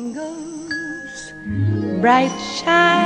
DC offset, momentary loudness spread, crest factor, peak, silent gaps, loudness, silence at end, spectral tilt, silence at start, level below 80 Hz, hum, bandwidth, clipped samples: under 0.1%; 16 LU; 18 dB; 0 dBFS; none; -19 LUFS; 0 s; -5 dB/octave; 0 s; -50 dBFS; none; 10 kHz; under 0.1%